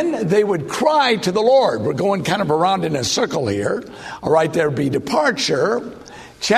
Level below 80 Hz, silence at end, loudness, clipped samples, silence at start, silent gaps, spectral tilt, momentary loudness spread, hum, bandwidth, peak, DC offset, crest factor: -54 dBFS; 0 s; -18 LUFS; under 0.1%; 0 s; none; -4.5 dB/octave; 11 LU; none; 13.5 kHz; -2 dBFS; under 0.1%; 16 dB